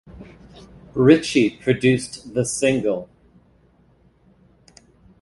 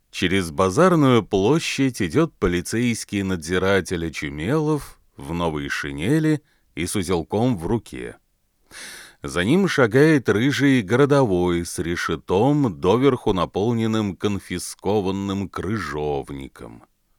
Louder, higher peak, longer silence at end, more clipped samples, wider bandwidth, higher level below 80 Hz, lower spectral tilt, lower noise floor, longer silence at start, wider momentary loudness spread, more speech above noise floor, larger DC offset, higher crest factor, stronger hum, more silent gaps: about the same, -19 LUFS vs -21 LUFS; first, 0 dBFS vs -4 dBFS; first, 2.2 s vs 0.4 s; neither; second, 11.5 kHz vs 18 kHz; second, -52 dBFS vs -44 dBFS; about the same, -5.5 dB/octave vs -6 dB/octave; about the same, -57 dBFS vs -58 dBFS; about the same, 0.15 s vs 0.15 s; about the same, 11 LU vs 12 LU; about the same, 38 dB vs 37 dB; neither; about the same, 22 dB vs 18 dB; neither; neither